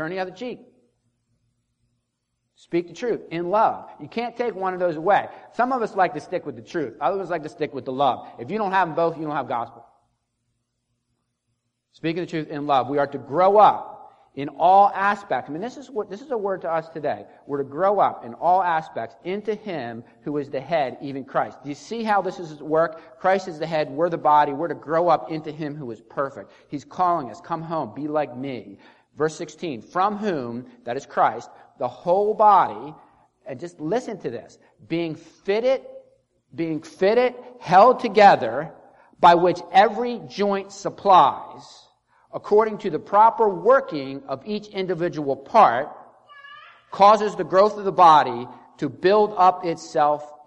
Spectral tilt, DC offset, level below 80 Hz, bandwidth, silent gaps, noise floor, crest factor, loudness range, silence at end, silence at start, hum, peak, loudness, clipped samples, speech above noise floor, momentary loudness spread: -6 dB/octave; under 0.1%; -68 dBFS; 8.6 kHz; none; -76 dBFS; 20 dB; 9 LU; 0.1 s; 0 s; none; -2 dBFS; -22 LUFS; under 0.1%; 55 dB; 17 LU